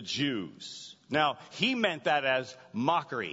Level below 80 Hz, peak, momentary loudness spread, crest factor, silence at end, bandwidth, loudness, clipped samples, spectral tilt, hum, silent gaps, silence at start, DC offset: -72 dBFS; -10 dBFS; 14 LU; 20 dB; 0 s; 8 kHz; -30 LUFS; under 0.1%; -4 dB/octave; none; none; 0 s; under 0.1%